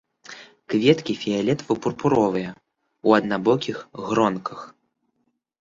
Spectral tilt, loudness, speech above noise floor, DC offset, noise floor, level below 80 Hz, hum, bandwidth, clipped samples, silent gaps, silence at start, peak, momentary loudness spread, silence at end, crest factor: -6 dB/octave; -22 LUFS; 51 dB; under 0.1%; -73 dBFS; -60 dBFS; none; 7.6 kHz; under 0.1%; none; 0.3 s; -2 dBFS; 20 LU; 0.9 s; 22 dB